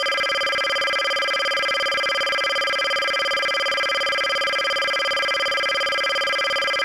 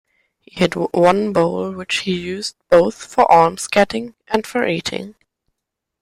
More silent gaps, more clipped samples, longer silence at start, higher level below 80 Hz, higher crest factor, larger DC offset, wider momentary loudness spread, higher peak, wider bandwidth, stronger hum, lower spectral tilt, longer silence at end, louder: neither; neither; second, 0 s vs 0.55 s; second, -60 dBFS vs -52 dBFS; second, 12 dB vs 18 dB; neither; second, 0 LU vs 13 LU; second, -10 dBFS vs -2 dBFS; about the same, 16.5 kHz vs 15 kHz; neither; second, 0 dB/octave vs -4.5 dB/octave; second, 0 s vs 0.9 s; second, -20 LUFS vs -17 LUFS